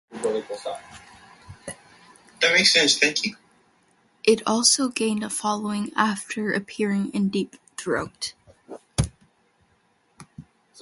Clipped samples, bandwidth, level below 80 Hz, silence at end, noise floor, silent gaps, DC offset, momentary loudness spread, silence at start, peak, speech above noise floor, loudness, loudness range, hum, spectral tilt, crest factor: under 0.1%; 11.5 kHz; -50 dBFS; 0 s; -65 dBFS; none; under 0.1%; 20 LU; 0.1 s; -2 dBFS; 42 dB; -22 LUFS; 10 LU; none; -2.5 dB/octave; 22 dB